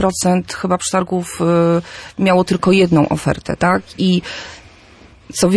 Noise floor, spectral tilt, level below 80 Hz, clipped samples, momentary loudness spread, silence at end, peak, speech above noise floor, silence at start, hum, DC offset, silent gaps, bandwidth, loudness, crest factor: -44 dBFS; -5.5 dB/octave; -44 dBFS; under 0.1%; 10 LU; 0 s; -2 dBFS; 28 dB; 0 s; none; under 0.1%; none; 11 kHz; -16 LUFS; 14 dB